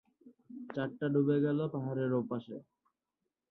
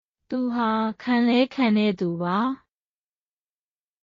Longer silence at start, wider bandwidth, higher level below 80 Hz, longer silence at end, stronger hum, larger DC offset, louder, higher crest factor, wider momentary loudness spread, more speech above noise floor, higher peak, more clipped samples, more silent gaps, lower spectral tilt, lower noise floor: about the same, 0.25 s vs 0.3 s; second, 4.2 kHz vs 7.2 kHz; second, -78 dBFS vs -68 dBFS; second, 0.9 s vs 1.45 s; neither; neither; second, -34 LUFS vs -23 LUFS; about the same, 16 dB vs 16 dB; first, 20 LU vs 8 LU; second, 55 dB vs over 68 dB; second, -18 dBFS vs -8 dBFS; neither; neither; first, -10.5 dB/octave vs -4.5 dB/octave; about the same, -88 dBFS vs under -90 dBFS